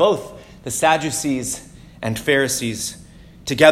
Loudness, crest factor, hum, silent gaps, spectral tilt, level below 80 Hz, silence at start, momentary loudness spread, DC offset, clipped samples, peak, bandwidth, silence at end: -20 LUFS; 20 dB; none; none; -3.5 dB/octave; -48 dBFS; 0 s; 15 LU; under 0.1%; under 0.1%; 0 dBFS; 16.5 kHz; 0 s